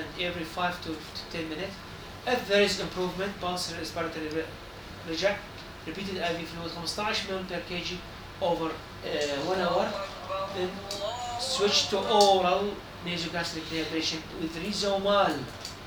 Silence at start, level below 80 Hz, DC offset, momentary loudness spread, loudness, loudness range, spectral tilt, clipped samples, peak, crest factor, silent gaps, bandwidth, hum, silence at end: 0 s; -52 dBFS; under 0.1%; 13 LU; -29 LUFS; 6 LU; -3.5 dB/octave; under 0.1%; -4 dBFS; 26 dB; none; over 20 kHz; none; 0 s